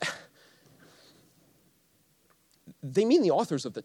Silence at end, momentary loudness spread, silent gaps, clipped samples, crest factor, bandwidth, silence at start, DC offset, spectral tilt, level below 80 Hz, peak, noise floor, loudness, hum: 0.05 s; 20 LU; none; under 0.1%; 18 dB; 14 kHz; 0 s; under 0.1%; -5.5 dB/octave; -80 dBFS; -14 dBFS; -67 dBFS; -26 LUFS; none